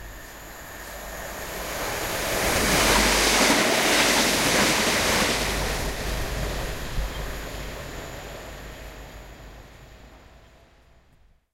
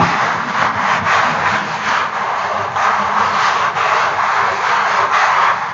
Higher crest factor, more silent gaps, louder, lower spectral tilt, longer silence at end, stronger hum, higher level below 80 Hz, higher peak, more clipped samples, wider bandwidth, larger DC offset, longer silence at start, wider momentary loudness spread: first, 20 dB vs 14 dB; neither; second, -22 LUFS vs -14 LUFS; about the same, -2 dB/octave vs -3 dB/octave; first, 1.35 s vs 0 s; neither; first, -36 dBFS vs -54 dBFS; second, -6 dBFS vs 0 dBFS; neither; first, 16 kHz vs 8 kHz; neither; about the same, 0 s vs 0 s; first, 22 LU vs 4 LU